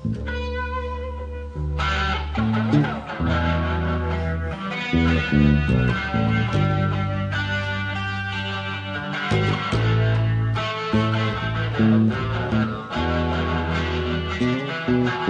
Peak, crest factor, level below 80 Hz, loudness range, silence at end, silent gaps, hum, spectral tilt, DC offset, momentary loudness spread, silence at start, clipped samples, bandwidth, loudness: -6 dBFS; 16 dB; -34 dBFS; 3 LU; 0 s; none; none; -7 dB/octave; under 0.1%; 8 LU; 0 s; under 0.1%; 8.8 kHz; -23 LUFS